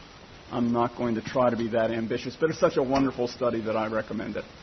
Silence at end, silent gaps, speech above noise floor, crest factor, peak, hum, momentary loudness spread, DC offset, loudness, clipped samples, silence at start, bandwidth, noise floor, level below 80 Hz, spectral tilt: 0 s; none; 21 dB; 18 dB; -8 dBFS; none; 8 LU; under 0.1%; -27 LUFS; under 0.1%; 0 s; 6.4 kHz; -47 dBFS; -54 dBFS; -6.5 dB/octave